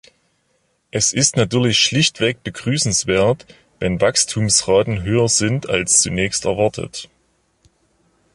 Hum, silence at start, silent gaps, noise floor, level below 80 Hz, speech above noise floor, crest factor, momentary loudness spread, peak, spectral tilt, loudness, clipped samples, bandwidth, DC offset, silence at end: none; 0.95 s; none; -65 dBFS; -44 dBFS; 47 dB; 18 dB; 11 LU; 0 dBFS; -3 dB/octave; -17 LUFS; under 0.1%; 11.5 kHz; under 0.1%; 1.3 s